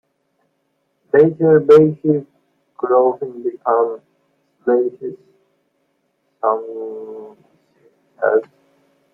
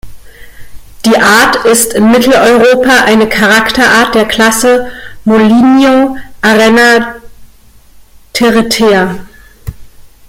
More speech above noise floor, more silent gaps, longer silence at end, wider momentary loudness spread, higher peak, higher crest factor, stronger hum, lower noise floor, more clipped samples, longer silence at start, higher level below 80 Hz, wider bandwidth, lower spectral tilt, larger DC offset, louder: first, 53 dB vs 32 dB; neither; first, 0.7 s vs 0.2 s; first, 20 LU vs 12 LU; about the same, -2 dBFS vs 0 dBFS; first, 16 dB vs 8 dB; neither; first, -68 dBFS vs -38 dBFS; second, under 0.1% vs 0.1%; first, 1.15 s vs 0.05 s; second, -66 dBFS vs -36 dBFS; second, 5.4 kHz vs 16.5 kHz; first, -9.5 dB/octave vs -3.5 dB/octave; neither; second, -16 LUFS vs -7 LUFS